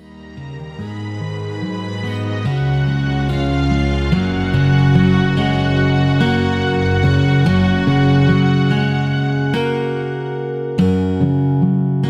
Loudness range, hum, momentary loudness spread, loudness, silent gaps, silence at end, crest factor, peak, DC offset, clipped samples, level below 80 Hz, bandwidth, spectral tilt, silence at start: 5 LU; none; 12 LU; -16 LUFS; none; 0 s; 14 dB; -2 dBFS; under 0.1%; under 0.1%; -32 dBFS; 7.8 kHz; -8 dB/octave; 0.1 s